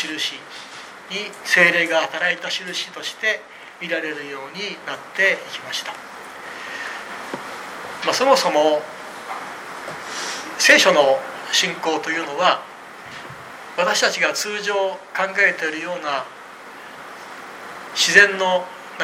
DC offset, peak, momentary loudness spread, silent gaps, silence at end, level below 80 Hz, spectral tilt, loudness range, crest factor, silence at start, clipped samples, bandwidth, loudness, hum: under 0.1%; 0 dBFS; 21 LU; none; 0 s; -70 dBFS; -1.5 dB/octave; 7 LU; 22 dB; 0 s; under 0.1%; 16.5 kHz; -19 LUFS; none